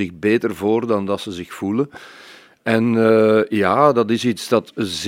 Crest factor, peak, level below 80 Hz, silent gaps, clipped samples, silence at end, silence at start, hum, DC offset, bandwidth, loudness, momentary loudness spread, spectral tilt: 18 dB; 0 dBFS; -60 dBFS; none; under 0.1%; 0 s; 0 s; none; under 0.1%; 16 kHz; -18 LUFS; 12 LU; -6 dB/octave